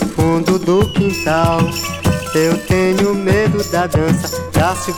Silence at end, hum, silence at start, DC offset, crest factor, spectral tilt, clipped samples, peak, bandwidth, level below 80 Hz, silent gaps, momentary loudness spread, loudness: 0 s; none; 0 s; under 0.1%; 12 dB; -5.5 dB/octave; under 0.1%; -2 dBFS; 20 kHz; -34 dBFS; none; 4 LU; -15 LUFS